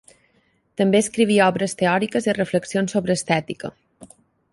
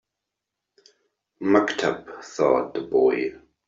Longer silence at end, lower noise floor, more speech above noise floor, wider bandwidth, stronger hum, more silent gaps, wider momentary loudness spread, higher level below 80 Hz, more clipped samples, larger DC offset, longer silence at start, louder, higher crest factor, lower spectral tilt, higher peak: first, 0.5 s vs 0.3 s; second, -64 dBFS vs -84 dBFS; second, 44 dB vs 62 dB; first, 11.5 kHz vs 7.8 kHz; neither; neither; about the same, 13 LU vs 11 LU; about the same, -60 dBFS vs -64 dBFS; neither; neither; second, 0.8 s vs 1.4 s; first, -20 LUFS vs -23 LUFS; about the same, 18 dB vs 20 dB; about the same, -5 dB/octave vs -5 dB/octave; about the same, -4 dBFS vs -4 dBFS